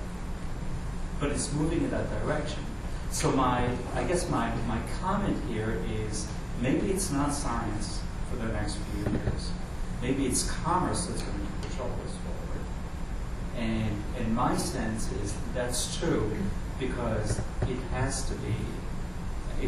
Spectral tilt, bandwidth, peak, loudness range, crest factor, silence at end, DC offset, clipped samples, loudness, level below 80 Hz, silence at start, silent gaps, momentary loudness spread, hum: -5 dB/octave; 14 kHz; -14 dBFS; 3 LU; 16 dB; 0 s; under 0.1%; under 0.1%; -31 LUFS; -36 dBFS; 0 s; none; 10 LU; none